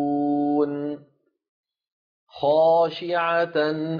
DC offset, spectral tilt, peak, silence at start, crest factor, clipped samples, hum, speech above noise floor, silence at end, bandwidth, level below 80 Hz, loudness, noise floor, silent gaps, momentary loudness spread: under 0.1%; -8 dB/octave; -10 dBFS; 0 s; 14 dB; under 0.1%; none; 36 dB; 0 s; 5.2 kHz; -72 dBFS; -22 LUFS; -57 dBFS; 1.49-1.63 s, 1.92-2.27 s; 11 LU